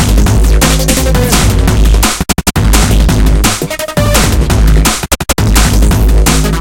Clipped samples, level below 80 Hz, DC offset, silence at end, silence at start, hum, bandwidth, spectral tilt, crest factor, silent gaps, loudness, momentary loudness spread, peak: 0.1%; -10 dBFS; under 0.1%; 0 s; 0 s; none; 17.5 kHz; -4.5 dB/octave; 8 dB; none; -9 LUFS; 3 LU; 0 dBFS